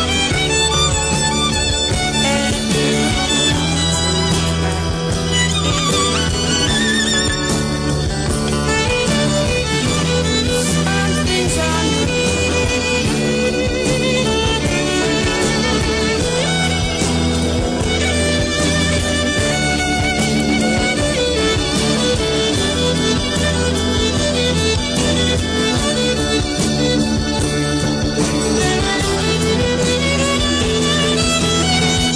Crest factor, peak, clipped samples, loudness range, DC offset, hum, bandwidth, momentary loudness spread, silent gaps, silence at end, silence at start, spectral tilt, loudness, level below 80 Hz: 12 dB; -4 dBFS; under 0.1%; 1 LU; under 0.1%; none; 11 kHz; 3 LU; none; 0 s; 0 s; -3.5 dB/octave; -16 LUFS; -28 dBFS